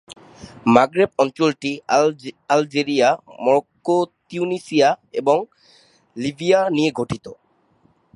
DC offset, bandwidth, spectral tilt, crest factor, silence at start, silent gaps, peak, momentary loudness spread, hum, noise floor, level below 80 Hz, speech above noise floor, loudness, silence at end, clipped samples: under 0.1%; 11.5 kHz; -5 dB/octave; 20 dB; 0.1 s; none; 0 dBFS; 11 LU; none; -60 dBFS; -58 dBFS; 41 dB; -19 LUFS; 0.8 s; under 0.1%